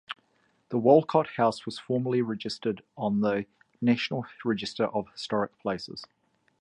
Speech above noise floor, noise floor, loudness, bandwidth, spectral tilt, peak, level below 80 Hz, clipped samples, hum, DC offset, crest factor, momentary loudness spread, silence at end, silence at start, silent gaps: 42 dB; -69 dBFS; -28 LUFS; 10.5 kHz; -6.5 dB/octave; -6 dBFS; -68 dBFS; under 0.1%; none; under 0.1%; 22 dB; 15 LU; 0.55 s; 0.1 s; none